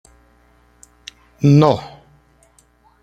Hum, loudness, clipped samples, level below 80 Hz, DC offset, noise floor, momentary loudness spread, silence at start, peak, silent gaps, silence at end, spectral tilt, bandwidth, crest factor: 60 Hz at -50 dBFS; -15 LUFS; under 0.1%; -52 dBFS; under 0.1%; -55 dBFS; 27 LU; 1.4 s; -2 dBFS; none; 1.15 s; -8 dB/octave; 8.8 kHz; 18 dB